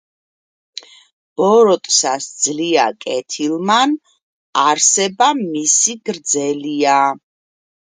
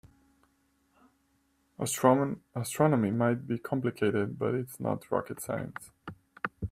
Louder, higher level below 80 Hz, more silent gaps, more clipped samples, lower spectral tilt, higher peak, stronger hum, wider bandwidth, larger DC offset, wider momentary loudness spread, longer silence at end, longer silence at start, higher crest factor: first, -15 LUFS vs -30 LUFS; second, -70 dBFS vs -62 dBFS; first, 4.22-4.53 s vs none; neither; second, -2 dB/octave vs -6 dB/octave; first, 0 dBFS vs -8 dBFS; neither; second, 10 kHz vs 16 kHz; neither; about the same, 13 LU vs 15 LU; first, 0.75 s vs 0 s; second, 1.4 s vs 1.8 s; second, 16 dB vs 22 dB